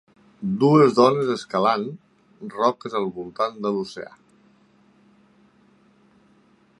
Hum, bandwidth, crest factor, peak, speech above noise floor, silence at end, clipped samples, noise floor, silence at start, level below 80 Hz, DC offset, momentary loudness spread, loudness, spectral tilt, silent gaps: none; 11 kHz; 22 dB; -2 dBFS; 37 dB; 2.75 s; under 0.1%; -58 dBFS; 0.4 s; -68 dBFS; under 0.1%; 22 LU; -21 LUFS; -7 dB/octave; none